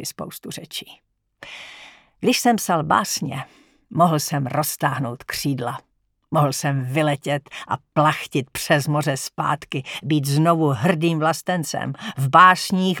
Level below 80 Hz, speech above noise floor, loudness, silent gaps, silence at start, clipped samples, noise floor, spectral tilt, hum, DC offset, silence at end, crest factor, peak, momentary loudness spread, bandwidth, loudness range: -60 dBFS; 25 dB; -21 LUFS; none; 0 s; under 0.1%; -45 dBFS; -5 dB/octave; none; under 0.1%; 0 s; 20 dB; 0 dBFS; 14 LU; 19.5 kHz; 5 LU